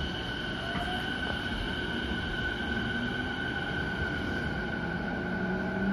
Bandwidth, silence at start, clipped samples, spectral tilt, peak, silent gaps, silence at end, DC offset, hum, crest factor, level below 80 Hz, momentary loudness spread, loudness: 14 kHz; 0 s; under 0.1%; -5.5 dB/octave; -16 dBFS; none; 0 s; under 0.1%; none; 16 dB; -42 dBFS; 2 LU; -32 LUFS